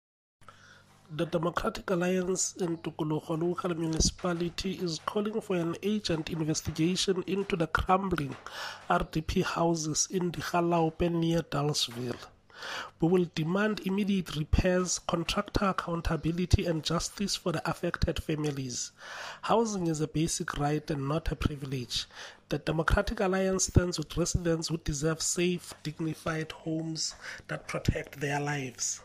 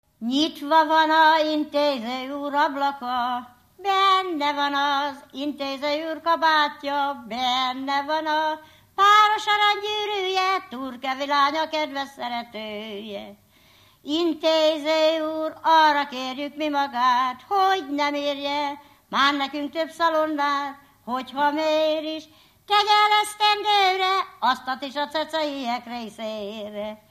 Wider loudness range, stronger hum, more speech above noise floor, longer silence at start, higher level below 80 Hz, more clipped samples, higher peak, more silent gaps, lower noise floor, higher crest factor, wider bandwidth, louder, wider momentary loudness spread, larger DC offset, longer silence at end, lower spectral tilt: about the same, 3 LU vs 4 LU; neither; second, 27 dB vs 33 dB; first, 0.4 s vs 0.2 s; first, -42 dBFS vs -68 dBFS; neither; about the same, -8 dBFS vs -6 dBFS; neither; about the same, -57 dBFS vs -56 dBFS; about the same, 22 dB vs 18 dB; about the same, 15.5 kHz vs 15 kHz; second, -31 LUFS vs -22 LUFS; second, 8 LU vs 14 LU; neither; second, 0 s vs 0.15 s; first, -4.5 dB/octave vs -2.5 dB/octave